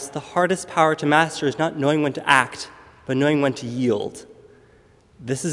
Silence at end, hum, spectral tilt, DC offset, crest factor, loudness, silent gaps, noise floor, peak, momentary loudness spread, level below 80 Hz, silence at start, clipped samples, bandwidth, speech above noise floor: 0 s; none; -5 dB/octave; under 0.1%; 22 dB; -21 LUFS; none; -54 dBFS; 0 dBFS; 16 LU; -62 dBFS; 0 s; under 0.1%; 11.5 kHz; 33 dB